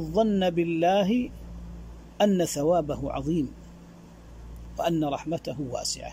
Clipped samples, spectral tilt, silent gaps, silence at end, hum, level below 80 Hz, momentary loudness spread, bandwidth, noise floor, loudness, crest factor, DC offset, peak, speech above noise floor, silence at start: under 0.1%; -5.5 dB/octave; none; 0 s; none; -46 dBFS; 21 LU; 16 kHz; -47 dBFS; -26 LUFS; 16 dB; under 0.1%; -10 dBFS; 22 dB; 0 s